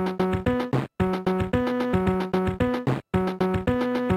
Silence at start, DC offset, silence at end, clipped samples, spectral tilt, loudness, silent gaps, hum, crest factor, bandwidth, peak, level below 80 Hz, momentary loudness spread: 0 s; under 0.1%; 0 s; under 0.1%; -8 dB/octave; -25 LUFS; none; none; 14 dB; 14.5 kHz; -10 dBFS; -42 dBFS; 2 LU